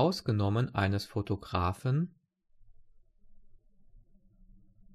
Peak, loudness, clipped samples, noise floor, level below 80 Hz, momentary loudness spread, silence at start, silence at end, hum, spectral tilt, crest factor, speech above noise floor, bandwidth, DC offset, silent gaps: -16 dBFS; -32 LUFS; under 0.1%; -62 dBFS; -56 dBFS; 5 LU; 0 s; 1.4 s; none; -7 dB/octave; 18 dB; 31 dB; 13 kHz; under 0.1%; none